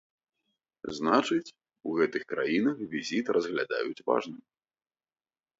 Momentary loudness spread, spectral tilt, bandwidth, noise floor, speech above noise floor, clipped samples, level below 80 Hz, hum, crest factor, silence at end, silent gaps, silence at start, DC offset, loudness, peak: 15 LU; -5 dB/octave; 8 kHz; under -90 dBFS; over 61 dB; under 0.1%; -72 dBFS; none; 22 dB; 1.2 s; none; 0.85 s; under 0.1%; -29 LUFS; -10 dBFS